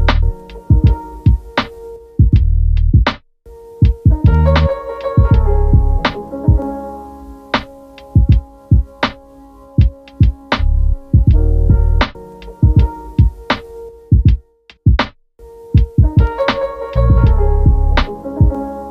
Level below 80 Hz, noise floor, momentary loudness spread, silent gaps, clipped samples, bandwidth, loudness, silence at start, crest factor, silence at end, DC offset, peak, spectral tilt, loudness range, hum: -16 dBFS; -41 dBFS; 11 LU; none; under 0.1%; 6.2 kHz; -15 LUFS; 0 s; 12 dB; 0 s; under 0.1%; 0 dBFS; -8.5 dB/octave; 3 LU; none